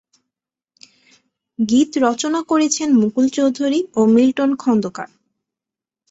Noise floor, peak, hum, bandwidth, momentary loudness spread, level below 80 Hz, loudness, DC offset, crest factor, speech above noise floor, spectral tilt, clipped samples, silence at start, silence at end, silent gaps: -88 dBFS; -4 dBFS; none; 8 kHz; 11 LU; -62 dBFS; -17 LUFS; under 0.1%; 16 dB; 72 dB; -4.5 dB/octave; under 0.1%; 1.6 s; 1.05 s; none